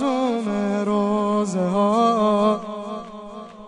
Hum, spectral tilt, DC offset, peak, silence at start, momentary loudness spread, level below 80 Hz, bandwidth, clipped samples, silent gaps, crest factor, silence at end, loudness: none; -6.5 dB/octave; under 0.1%; -8 dBFS; 0 s; 16 LU; -60 dBFS; 10.5 kHz; under 0.1%; none; 14 dB; 0 s; -21 LUFS